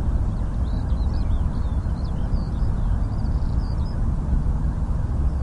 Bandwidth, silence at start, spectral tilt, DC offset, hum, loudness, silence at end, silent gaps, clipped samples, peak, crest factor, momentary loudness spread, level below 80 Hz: 6 kHz; 0 s; -9 dB/octave; under 0.1%; none; -26 LUFS; 0 s; none; under 0.1%; -10 dBFS; 12 dB; 2 LU; -24 dBFS